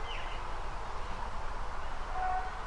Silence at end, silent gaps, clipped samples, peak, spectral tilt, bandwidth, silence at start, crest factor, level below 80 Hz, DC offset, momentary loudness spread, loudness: 0 s; none; under 0.1%; -22 dBFS; -4 dB/octave; 10.5 kHz; 0 s; 12 dB; -40 dBFS; under 0.1%; 6 LU; -40 LUFS